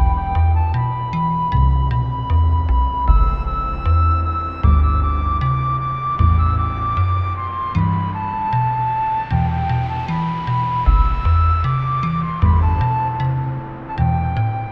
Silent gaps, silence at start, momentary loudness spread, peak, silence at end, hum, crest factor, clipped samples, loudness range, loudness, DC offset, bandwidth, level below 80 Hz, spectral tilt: none; 0 s; 6 LU; -2 dBFS; 0 s; none; 16 dB; under 0.1%; 2 LU; -19 LUFS; under 0.1%; 5.2 kHz; -20 dBFS; -9.5 dB/octave